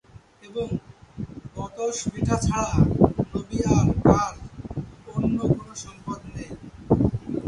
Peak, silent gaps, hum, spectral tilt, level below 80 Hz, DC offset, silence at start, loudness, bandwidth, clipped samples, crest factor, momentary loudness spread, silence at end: 0 dBFS; none; none; -7 dB/octave; -38 dBFS; under 0.1%; 0.45 s; -24 LUFS; 11.5 kHz; under 0.1%; 24 dB; 18 LU; 0 s